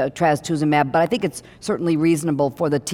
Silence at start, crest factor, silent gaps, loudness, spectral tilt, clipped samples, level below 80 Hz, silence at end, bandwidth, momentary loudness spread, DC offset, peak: 0 s; 16 dB; none; -20 LUFS; -6 dB/octave; under 0.1%; -56 dBFS; 0 s; 16.5 kHz; 7 LU; under 0.1%; -4 dBFS